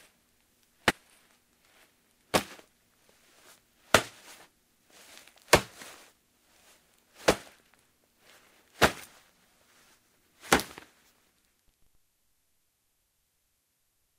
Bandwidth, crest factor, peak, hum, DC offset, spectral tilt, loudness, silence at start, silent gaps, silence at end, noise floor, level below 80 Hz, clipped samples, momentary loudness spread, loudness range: 16 kHz; 34 dB; -2 dBFS; none; under 0.1%; -2.5 dB/octave; -28 LUFS; 0.85 s; none; 3.55 s; -75 dBFS; -56 dBFS; under 0.1%; 27 LU; 5 LU